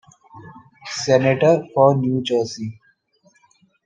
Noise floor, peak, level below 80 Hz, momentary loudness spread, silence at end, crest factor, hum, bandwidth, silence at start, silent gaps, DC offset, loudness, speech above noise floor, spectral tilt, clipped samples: -60 dBFS; -2 dBFS; -66 dBFS; 16 LU; 1.15 s; 20 dB; none; 9.2 kHz; 0.35 s; none; under 0.1%; -18 LUFS; 42 dB; -6 dB/octave; under 0.1%